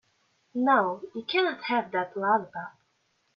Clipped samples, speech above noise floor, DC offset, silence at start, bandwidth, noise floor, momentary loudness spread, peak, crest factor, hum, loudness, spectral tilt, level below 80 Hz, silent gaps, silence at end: under 0.1%; 45 dB; under 0.1%; 0.55 s; 6.6 kHz; -72 dBFS; 15 LU; -10 dBFS; 18 dB; none; -27 LUFS; -6.5 dB/octave; -78 dBFS; none; 0.65 s